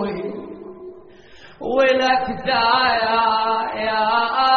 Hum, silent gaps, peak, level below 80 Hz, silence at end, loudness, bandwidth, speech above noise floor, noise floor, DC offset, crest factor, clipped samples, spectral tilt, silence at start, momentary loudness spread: none; none; -4 dBFS; -50 dBFS; 0 s; -18 LUFS; 6.6 kHz; 27 dB; -45 dBFS; under 0.1%; 16 dB; under 0.1%; -0.5 dB/octave; 0 s; 19 LU